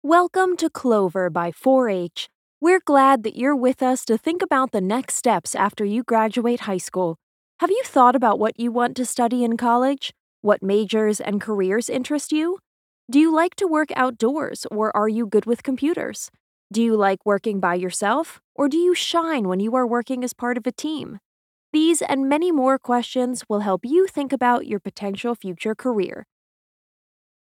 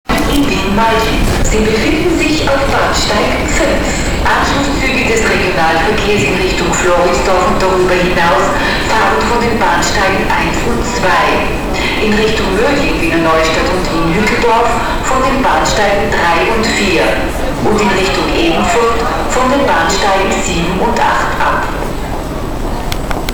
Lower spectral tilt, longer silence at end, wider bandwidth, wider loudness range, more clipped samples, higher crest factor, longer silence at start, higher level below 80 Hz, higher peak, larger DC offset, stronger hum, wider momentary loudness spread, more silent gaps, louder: about the same, -4.5 dB/octave vs -4 dB/octave; first, 1.3 s vs 0 s; second, 16 kHz vs over 20 kHz; about the same, 3 LU vs 1 LU; neither; first, 20 dB vs 10 dB; about the same, 0.05 s vs 0.1 s; second, -70 dBFS vs -22 dBFS; about the same, -2 dBFS vs 0 dBFS; neither; neither; first, 9 LU vs 4 LU; first, 2.35-2.61 s, 7.23-7.59 s, 10.20-10.43 s, 12.67-13.08 s, 16.40-16.70 s, 18.44-18.55 s, 21.25-21.73 s vs none; second, -21 LUFS vs -12 LUFS